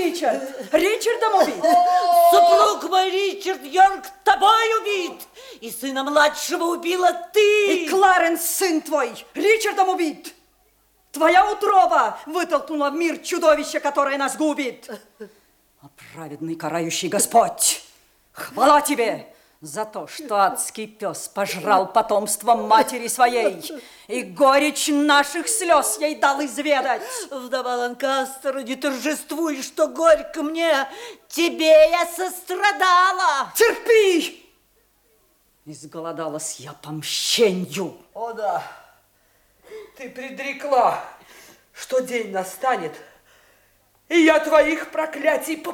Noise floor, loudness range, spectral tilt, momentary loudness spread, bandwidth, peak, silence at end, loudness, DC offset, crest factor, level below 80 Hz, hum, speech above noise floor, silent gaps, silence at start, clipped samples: -62 dBFS; 8 LU; -2.5 dB/octave; 15 LU; 18.5 kHz; -2 dBFS; 0 s; -20 LUFS; under 0.1%; 18 dB; -60 dBFS; none; 42 dB; none; 0 s; under 0.1%